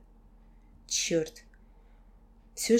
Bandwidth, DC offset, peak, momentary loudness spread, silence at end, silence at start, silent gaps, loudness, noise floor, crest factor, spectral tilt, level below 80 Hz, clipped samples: 16.5 kHz; under 0.1%; -12 dBFS; 20 LU; 0 s; 0.9 s; none; -31 LUFS; -57 dBFS; 22 dB; -3 dB/octave; -56 dBFS; under 0.1%